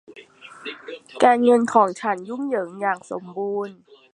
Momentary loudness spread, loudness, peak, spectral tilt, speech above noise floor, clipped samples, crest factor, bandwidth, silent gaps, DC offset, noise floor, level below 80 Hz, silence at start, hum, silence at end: 19 LU; -21 LUFS; -2 dBFS; -5 dB/octave; 23 dB; under 0.1%; 20 dB; 10.5 kHz; none; under 0.1%; -45 dBFS; -74 dBFS; 0.1 s; none; 0.4 s